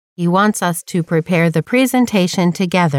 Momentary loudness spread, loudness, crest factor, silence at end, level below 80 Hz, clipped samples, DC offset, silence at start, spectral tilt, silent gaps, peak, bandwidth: 4 LU; -15 LUFS; 12 dB; 0 s; -60 dBFS; under 0.1%; under 0.1%; 0.2 s; -5.5 dB/octave; none; -2 dBFS; 16.5 kHz